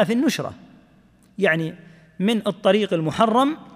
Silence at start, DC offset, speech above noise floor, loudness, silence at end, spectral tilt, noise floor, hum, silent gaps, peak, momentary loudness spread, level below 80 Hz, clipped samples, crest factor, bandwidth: 0 s; under 0.1%; 34 dB; -21 LUFS; 0.05 s; -5.5 dB/octave; -55 dBFS; none; none; -4 dBFS; 11 LU; -62 dBFS; under 0.1%; 18 dB; 15.5 kHz